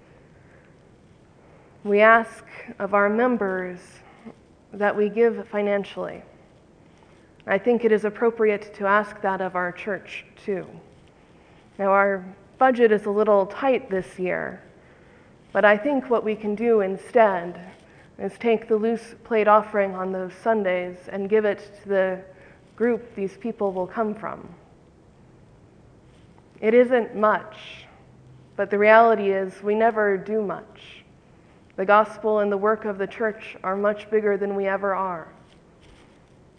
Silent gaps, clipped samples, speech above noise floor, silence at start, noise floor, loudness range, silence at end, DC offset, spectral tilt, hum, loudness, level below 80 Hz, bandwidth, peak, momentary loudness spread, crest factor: none; under 0.1%; 31 dB; 1.85 s; -53 dBFS; 6 LU; 1.3 s; under 0.1%; -7 dB/octave; none; -22 LUFS; -62 dBFS; 10 kHz; -2 dBFS; 16 LU; 22 dB